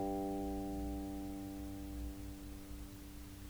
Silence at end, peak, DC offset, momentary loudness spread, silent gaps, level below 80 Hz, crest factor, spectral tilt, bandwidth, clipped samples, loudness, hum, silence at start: 0 s; -30 dBFS; under 0.1%; 11 LU; none; -50 dBFS; 14 dB; -6.5 dB/octave; over 20 kHz; under 0.1%; -45 LUFS; none; 0 s